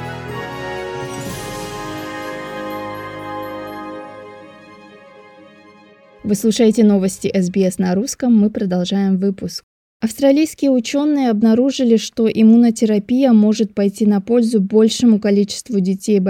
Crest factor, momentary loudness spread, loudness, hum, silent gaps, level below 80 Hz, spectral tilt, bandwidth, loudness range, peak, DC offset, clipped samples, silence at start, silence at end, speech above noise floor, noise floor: 14 dB; 15 LU; -16 LUFS; none; 9.63-10.00 s; -52 dBFS; -6 dB/octave; 15 kHz; 15 LU; -2 dBFS; under 0.1%; under 0.1%; 0 s; 0 s; 32 dB; -46 dBFS